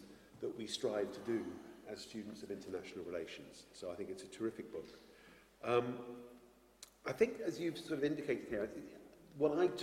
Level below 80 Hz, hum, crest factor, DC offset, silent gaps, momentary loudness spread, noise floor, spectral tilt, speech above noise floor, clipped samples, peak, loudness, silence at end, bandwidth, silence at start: -74 dBFS; none; 22 dB; under 0.1%; none; 20 LU; -64 dBFS; -5 dB/octave; 23 dB; under 0.1%; -18 dBFS; -41 LUFS; 0 s; 16 kHz; 0 s